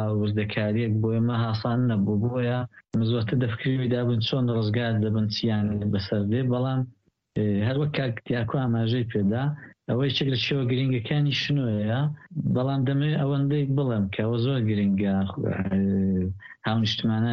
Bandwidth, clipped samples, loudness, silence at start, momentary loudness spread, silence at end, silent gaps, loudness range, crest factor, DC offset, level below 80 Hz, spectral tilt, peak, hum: 6.6 kHz; under 0.1%; -25 LUFS; 0 s; 4 LU; 0 s; none; 1 LU; 12 dB; under 0.1%; -56 dBFS; -8 dB/octave; -12 dBFS; none